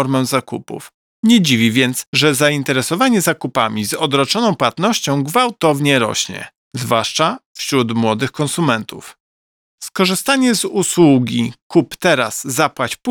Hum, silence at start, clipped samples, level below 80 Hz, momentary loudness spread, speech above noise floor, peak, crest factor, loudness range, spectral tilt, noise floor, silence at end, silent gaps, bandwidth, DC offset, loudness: none; 0 s; under 0.1%; -60 dBFS; 10 LU; over 74 dB; 0 dBFS; 16 dB; 4 LU; -4 dB/octave; under -90 dBFS; 0 s; 0.94-1.23 s, 2.07-2.13 s, 6.58-6.71 s, 7.46-7.55 s, 9.20-9.78 s, 11.62-11.70 s; over 20 kHz; under 0.1%; -15 LUFS